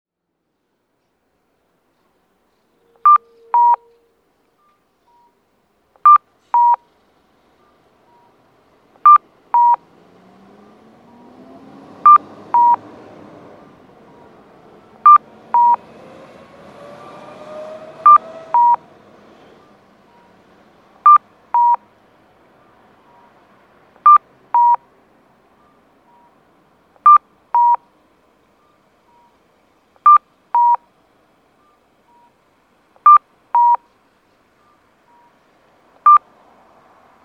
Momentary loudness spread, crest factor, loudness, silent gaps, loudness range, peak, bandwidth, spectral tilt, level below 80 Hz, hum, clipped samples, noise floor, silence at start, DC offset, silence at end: 11 LU; 18 dB; -13 LUFS; none; 2 LU; 0 dBFS; 4.2 kHz; -5.5 dB/octave; -72 dBFS; none; under 0.1%; -73 dBFS; 3.05 s; under 0.1%; 1.05 s